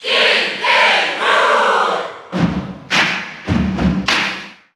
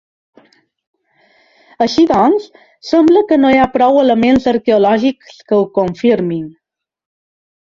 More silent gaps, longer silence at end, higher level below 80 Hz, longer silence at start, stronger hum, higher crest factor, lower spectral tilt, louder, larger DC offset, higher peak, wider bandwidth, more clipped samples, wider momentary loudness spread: neither; second, 0.25 s vs 1.25 s; first, -38 dBFS vs -48 dBFS; second, 0 s vs 1.8 s; neither; about the same, 14 dB vs 14 dB; second, -4 dB/octave vs -6.5 dB/octave; second, -15 LUFS vs -12 LUFS; neither; about the same, -2 dBFS vs 0 dBFS; first, 13.5 kHz vs 7.4 kHz; neither; about the same, 11 LU vs 9 LU